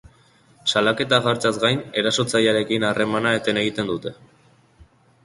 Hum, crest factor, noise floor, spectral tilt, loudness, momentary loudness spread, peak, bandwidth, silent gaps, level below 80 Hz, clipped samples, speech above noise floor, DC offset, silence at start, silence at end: none; 20 dB; -55 dBFS; -4 dB/octave; -20 LUFS; 7 LU; -2 dBFS; 11.5 kHz; none; -58 dBFS; under 0.1%; 34 dB; under 0.1%; 0.65 s; 0.4 s